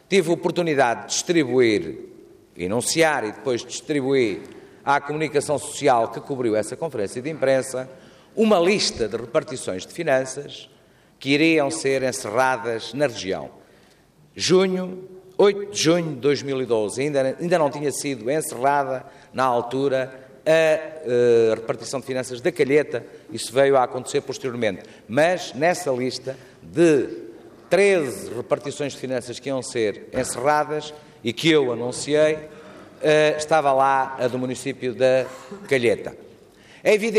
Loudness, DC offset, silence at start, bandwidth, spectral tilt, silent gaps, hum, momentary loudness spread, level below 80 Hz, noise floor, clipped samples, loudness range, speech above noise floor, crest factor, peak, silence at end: -22 LUFS; under 0.1%; 0.1 s; 15 kHz; -4.5 dB/octave; none; none; 13 LU; -62 dBFS; -55 dBFS; under 0.1%; 2 LU; 33 dB; 16 dB; -6 dBFS; 0 s